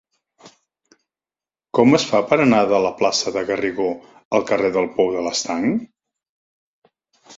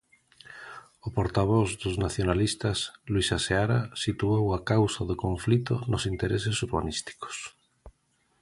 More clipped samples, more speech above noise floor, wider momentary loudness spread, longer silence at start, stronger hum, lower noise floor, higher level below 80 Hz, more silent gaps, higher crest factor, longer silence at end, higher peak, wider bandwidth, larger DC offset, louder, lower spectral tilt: neither; first, over 72 dB vs 44 dB; second, 8 LU vs 13 LU; about the same, 0.45 s vs 0.5 s; neither; first, under -90 dBFS vs -71 dBFS; second, -58 dBFS vs -44 dBFS; first, 4.25-4.31 s, 6.29-6.82 s vs none; about the same, 20 dB vs 20 dB; second, 0.05 s vs 0.5 s; first, 0 dBFS vs -8 dBFS; second, 7.8 kHz vs 11.5 kHz; neither; first, -19 LUFS vs -28 LUFS; about the same, -4.5 dB/octave vs -5.5 dB/octave